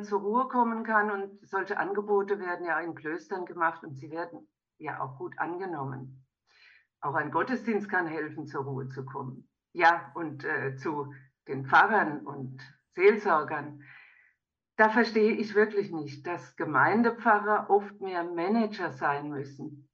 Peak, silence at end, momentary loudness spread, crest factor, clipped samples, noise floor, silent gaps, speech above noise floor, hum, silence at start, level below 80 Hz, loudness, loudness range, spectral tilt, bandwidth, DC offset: -10 dBFS; 0.15 s; 16 LU; 20 dB; under 0.1%; -76 dBFS; none; 48 dB; none; 0 s; -80 dBFS; -29 LUFS; 8 LU; -7 dB/octave; 7 kHz; under 0.1%